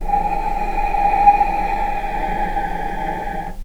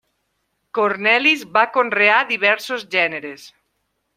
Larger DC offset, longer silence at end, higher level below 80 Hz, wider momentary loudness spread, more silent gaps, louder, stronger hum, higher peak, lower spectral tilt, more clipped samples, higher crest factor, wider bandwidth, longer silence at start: neither; second, 0 s vs 0.7 s; first, -26 dBFS vs -72 dBFS; about the same, 11 LU vs 9 LU; neither; about the same, -19 LUFS vs -17 LUFS; neither; about the same, 0 dBFS vs -2 dBFS; first, -6 dB/octave vs -3 dB/octave; neither; about the same, 18 dB vs 18 dB; second, 14.5 kHz vs 16 kHz; second, 0 s vs 0.75 s